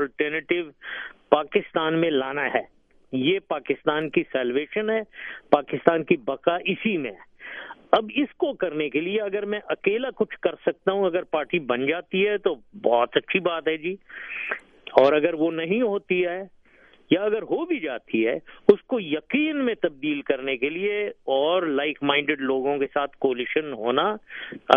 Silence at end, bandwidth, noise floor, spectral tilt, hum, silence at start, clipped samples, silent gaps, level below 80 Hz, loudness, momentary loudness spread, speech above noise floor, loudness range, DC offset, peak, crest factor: 0 s; 5.4 kHz; -55 dBFS; -7.5 dB/octave; none; 0 s; under 0.1%; none; -64 dBFS; -24 LUFS; 8 LU; 31 dB; 2 LU; under 0.1%; 0 dBFS; 24 dB